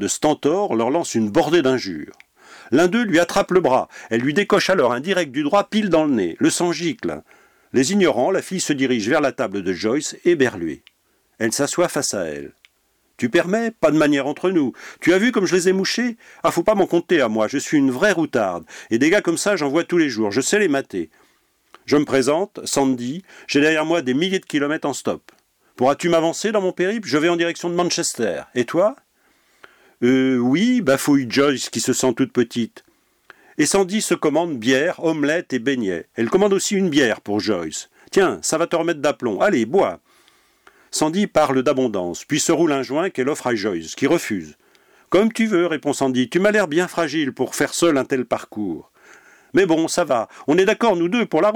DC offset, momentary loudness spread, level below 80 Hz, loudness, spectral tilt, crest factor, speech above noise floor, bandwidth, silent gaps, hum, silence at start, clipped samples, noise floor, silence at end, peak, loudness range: under 0.1%; 8 LU; -58 dBFS; -19 LUFS; -4 dB/octave; 14 dB; 46 dB; 18.5 kHz; none; none; 0 s; under 0.1%; -65 dBFS; 0 s; -6 dBFS; 2 LU